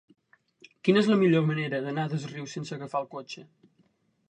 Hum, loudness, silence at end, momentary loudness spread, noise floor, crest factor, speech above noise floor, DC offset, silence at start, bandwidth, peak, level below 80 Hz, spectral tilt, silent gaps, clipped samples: none; -27 LUFS; 0.85 s; 17 LU; -68 dBFS; 20 dB; 41 dB; under 0.1%; 0.85 s; 9.6 kHz; -8 dBFS; -72 dBFS; -7 dB/octave; none; under 0.1%